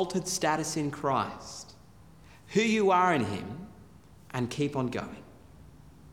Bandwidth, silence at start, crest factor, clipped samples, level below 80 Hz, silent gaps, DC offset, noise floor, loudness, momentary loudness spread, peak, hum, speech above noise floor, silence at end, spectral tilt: 18.5 kHz; 0 s; 18 dB; under 0.1%; -60 dBFS; none; 0.1%; -54 dBFS; -29 LUFS; 20 LU; -12 dBFS; none; 26 dB; 0 s; -4.5 dB/octave